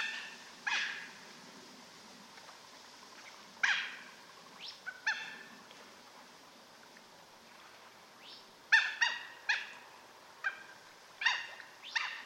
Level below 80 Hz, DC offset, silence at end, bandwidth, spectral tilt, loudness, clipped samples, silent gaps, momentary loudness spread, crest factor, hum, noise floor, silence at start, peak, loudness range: -88 dBFS; under 0.1%; 0 s; 16 kHz; 0.5 dB/octave; -35 LUFS; under 0.1%; none; 23 LU; 26 dB; none; -58 dBFS; 0 s; -14 dBFS; 10 LU